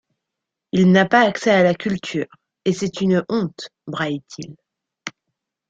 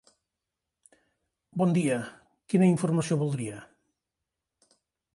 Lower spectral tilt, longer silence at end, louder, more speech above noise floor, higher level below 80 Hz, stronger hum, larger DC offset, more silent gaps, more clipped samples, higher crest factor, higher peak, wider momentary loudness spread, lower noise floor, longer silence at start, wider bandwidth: about the same, -6 dB/octave vs -7 dB/octave; second, 0.6 s vs 1.5 s; first, -19 LUFS vs -27 LUFS; about the same, 64 dB vs 61 dB; first, -60 dBFS vs -70 dBFS; neither; neither; neither; neither; about the same, 18 dB vs 20 dB; first, -2 dBFS vs -10 dBFS; first, 20 LU vs 16 LU; second, -83 dBFS vs -87 dBFS; second, 0.75 s vs 1.55 s; second, 7.8 kHz vs 11.5 kHz